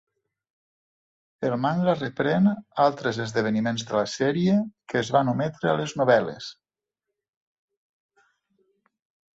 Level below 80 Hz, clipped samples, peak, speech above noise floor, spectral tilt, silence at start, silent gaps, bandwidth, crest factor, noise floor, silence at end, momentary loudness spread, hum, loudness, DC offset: -64 dBFS; under 0.1%; -6 dBFS; 64 dB; -6 dB/octave; 1.4 s; none; 8 kHz; 20 dB; -88 dBFS; 2.85 s; 7 LU; none; -24 LUFS; under 0.1%